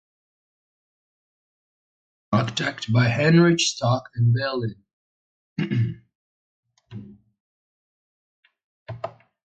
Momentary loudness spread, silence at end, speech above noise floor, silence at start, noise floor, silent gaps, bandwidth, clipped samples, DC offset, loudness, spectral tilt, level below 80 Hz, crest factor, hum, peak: 24 LU; 0.35 s; 21 dB; 2.3 s; -41 dBFS; 4.93-5.56 s, 6.15-6.63 s, 7.40-8.43 s, 8.64-8.86 s; 9.2 kHz; under 0.1%; under 0.1%; -22 LUFS; -5.5 dB/octave; -58 dBFS; 20 dB; none; -6 dBFS